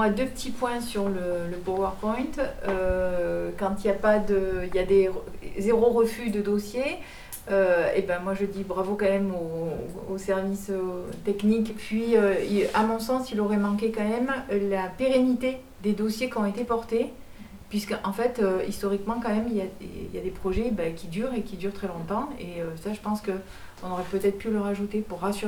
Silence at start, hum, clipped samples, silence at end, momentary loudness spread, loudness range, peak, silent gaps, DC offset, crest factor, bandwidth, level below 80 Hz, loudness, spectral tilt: 0 s; none; under 0.1%; 0 s; 11 LU; 6 LU; -10 dBFS; none; under 0.1%; 18 dB; 20 kHz; -44 dBFS; -27 LUFS; -6 dB/octave